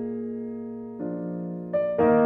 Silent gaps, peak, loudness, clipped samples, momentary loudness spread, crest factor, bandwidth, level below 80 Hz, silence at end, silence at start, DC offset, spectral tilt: none; -10 dBFS; -29 LUFS; under 0.1%; 12 LU; 16 dB; 3.6 kHz; -60 dBFS; 0 s; 0 s; under 0.1%; -11.5 dB/octave